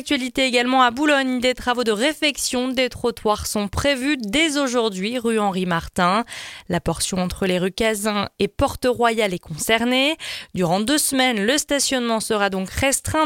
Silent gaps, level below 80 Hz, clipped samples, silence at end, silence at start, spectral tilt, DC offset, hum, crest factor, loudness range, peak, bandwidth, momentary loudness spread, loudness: none; -42 dBFS; under 0.1%; 0 s; 0 s; -3.5 dB/octave; under 0.1%; none; 18 dB; 3 LU; -4 dBFS; 17 kHz; 6 LU; -20 LUFS